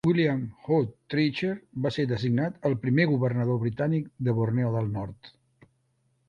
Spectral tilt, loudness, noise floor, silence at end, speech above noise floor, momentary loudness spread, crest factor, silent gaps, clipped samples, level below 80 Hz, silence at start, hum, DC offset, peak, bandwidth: -8.5 dB/octave; -27 LUFS; -71 dBFS; 1 s; 45 dB; 7 LU; 18 dB; none; under 0.1%; -58 dBFS; 0.05 s; none; under 0.1%; -10 dBFS; 7.2 kHz